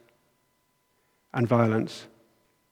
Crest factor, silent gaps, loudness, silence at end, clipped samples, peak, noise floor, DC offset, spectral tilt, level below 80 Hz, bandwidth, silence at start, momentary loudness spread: 22 dB; none; -26 LUFS; 0.65 s; under 0.1%; -8 dBFS; -71 dBFS; under 0.1%; -8 dB/octave; -74 dBFS; 12 kHz; 1.35 s; 14 LU